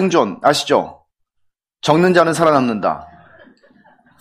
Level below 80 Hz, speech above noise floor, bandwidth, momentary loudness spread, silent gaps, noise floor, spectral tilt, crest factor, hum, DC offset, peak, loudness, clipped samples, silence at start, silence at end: -56 dBFS; 53 dB; 15.5 kHz; 10 LU; none; -68 dBFS; -5 dB/octave; 18 dB; none; under 0.1%; 0 dBFS; -15 LUFS; under 0.1%; 0 s; 1.15 s